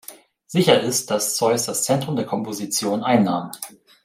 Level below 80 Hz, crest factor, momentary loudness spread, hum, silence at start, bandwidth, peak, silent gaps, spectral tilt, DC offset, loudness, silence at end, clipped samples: -64 dBFS; 18 dB; 13 LU; none; 0.1 s; 16 kHz; -2 dBFS; none; -4 dB/octave; under 0.1%; -20 LUFS; 0.35 s; under 0.1%